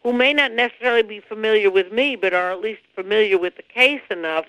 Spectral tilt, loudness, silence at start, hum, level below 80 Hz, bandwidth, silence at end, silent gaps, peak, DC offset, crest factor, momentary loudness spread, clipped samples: -4 dB/octave; -19 LUFS; 0.05 s; none; -64 dBFS; 12 kHz; 0.05 s; none; -2 dBFS; under 0.1%; 18 dB; 10 LU; under 0.1%